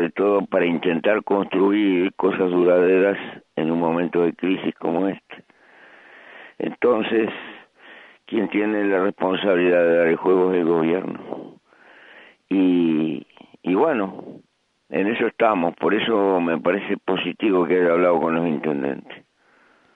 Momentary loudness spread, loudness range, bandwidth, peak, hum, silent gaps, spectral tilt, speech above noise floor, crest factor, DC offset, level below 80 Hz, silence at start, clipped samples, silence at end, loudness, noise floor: 11 LU; 5 LU; 4.5 kHz; -4 dBFS; none; none; -8.5 dB/octave; 38 dB; 18 dB; under 0.1%; -66 dBFS; 0 s; under 0.1%; 0.8 s; -20 LUFS; -58 dBFS